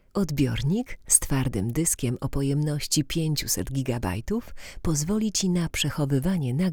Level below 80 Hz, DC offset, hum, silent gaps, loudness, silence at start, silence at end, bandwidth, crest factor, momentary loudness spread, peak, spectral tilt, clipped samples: -40 dBFS; under 0.1%; none; none; -25 LUFS; 0.15 s; 0 s; over 20 kHz; 20 dB; 8 LU; -6 dBFS; -4.5 dB/octave; under 0.1%